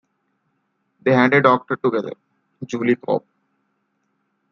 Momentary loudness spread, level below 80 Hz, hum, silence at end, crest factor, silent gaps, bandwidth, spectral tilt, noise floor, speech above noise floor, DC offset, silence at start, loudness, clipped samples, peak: 15 LU; -68 dBFS; none; 1.35 s; 20 dB; none; 7.2 kHz; -7 dB/octave; -70 dBFS; 52 dB; under 0.1%; 1.05 s; -19 LUFS; under 0.1%; -2 dBFS